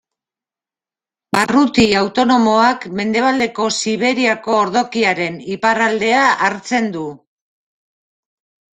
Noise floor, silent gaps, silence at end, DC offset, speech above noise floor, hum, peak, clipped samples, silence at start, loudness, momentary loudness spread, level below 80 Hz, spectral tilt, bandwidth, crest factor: under -90 dBFS; none; 1.55 s; under 0.1%; over 75 dB; none; 0 dBFS; under 0.1%; 1.35 s; -15 LUFS; 8 LU; -52 dBFS; -4 dB/octave; 12 kHz; 16 dB